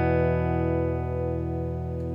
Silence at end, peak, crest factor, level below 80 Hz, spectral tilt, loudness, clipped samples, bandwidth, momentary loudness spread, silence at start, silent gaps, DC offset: 0 s; -12 dBFS; 14 dB; -42 dBFS; -10.5 dB/octave; -27 LUFS; under 0.1%; 5.2 kHz; 7 LU; 0 s; none; under 0.1%